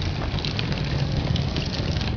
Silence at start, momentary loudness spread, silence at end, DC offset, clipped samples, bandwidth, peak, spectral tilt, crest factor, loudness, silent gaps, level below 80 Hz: 0 s; 2 LU; 0 s; 0.2%; under 0.1%; 5.4 kHz; -8 dBFS; -6 dB/octave; 16 dB; -25 LUFS; none; -32 dBFS